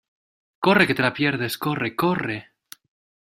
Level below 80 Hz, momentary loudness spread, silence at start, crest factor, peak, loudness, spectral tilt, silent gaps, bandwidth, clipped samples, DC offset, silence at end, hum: -60 dBFS; 9 LU; 0.6 s; 22 dB; -2 dBFS; -22 LUFS; -5.5 dB/octave; none; 16 kHz; under 0.1%; under 0.1%; 0.95 s; none